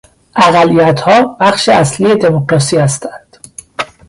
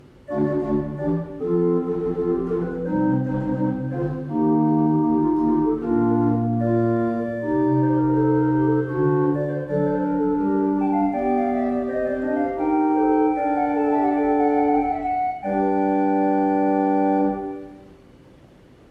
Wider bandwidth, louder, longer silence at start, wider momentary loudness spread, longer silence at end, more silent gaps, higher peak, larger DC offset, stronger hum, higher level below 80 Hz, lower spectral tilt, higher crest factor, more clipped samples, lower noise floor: first, 11.5 kHz vs 3.7 kHz; first, -10 LUFS vs -21 LUFS; about the same, 0.35 s vs 0.3 s; first, 14 LU vs 6 LU; second, 0.25 s vs 0.95 s; neither; first, 0 dBFS vs -8 dBFS; neither; neither; about the same, -46 dBFS vs -48 dBFS; second, -5 dB/octave vs -11 dB/octave; about the same, 10 dB vs 12 dB; neither; second, -35 dBFS vs -49 dBFS